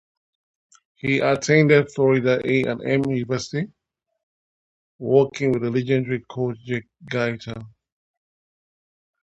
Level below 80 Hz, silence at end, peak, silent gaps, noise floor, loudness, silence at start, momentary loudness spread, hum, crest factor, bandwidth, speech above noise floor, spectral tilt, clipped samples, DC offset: -60 dBFS; 1.6 s; -2 dBFS; 4.23-4.99 s; under -90 dBFS; -21 LUFS; 1.05 s; 13 LU; none; 20 dB; 8.2 kHz; over 69 dB; -6.5 dB/octave; under 0.1%; under 0.1%